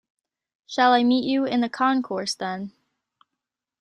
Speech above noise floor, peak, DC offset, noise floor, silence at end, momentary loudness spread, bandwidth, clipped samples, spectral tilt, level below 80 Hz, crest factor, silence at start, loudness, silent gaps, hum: 63 dB; -6 dBFS; under 0.1%; -85 dBFS; 1.1 s; 13 LU; 11.5 kHz; under 0.1%; -4 dB/octave; -72 dBFS; 20 dB; 0.7 s; -22 LUFS; none; none